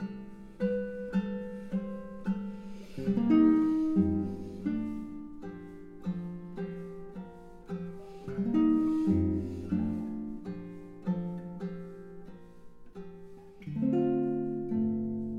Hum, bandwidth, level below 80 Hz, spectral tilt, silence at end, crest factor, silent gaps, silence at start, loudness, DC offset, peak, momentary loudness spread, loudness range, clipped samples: none; 6.8 kHz; -58 dBFS; -9.5 dB/octave; 0 s; 18 dB; none; 0 s; -32 LUFS; under 0.1%; -14 dBFS; 21 LU; 11 LU; under 0.1%